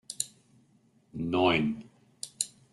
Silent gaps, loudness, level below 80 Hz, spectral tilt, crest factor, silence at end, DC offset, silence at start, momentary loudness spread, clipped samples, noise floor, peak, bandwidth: none; -30 LUFS; -64 dBFS; -3.5 dB/octave; 24 dB; 0.25 s; under 0.1%; 0.1 s; 18 LU; under 0.1%; -65 dBFS; -10 dBFS; 12.5 kHz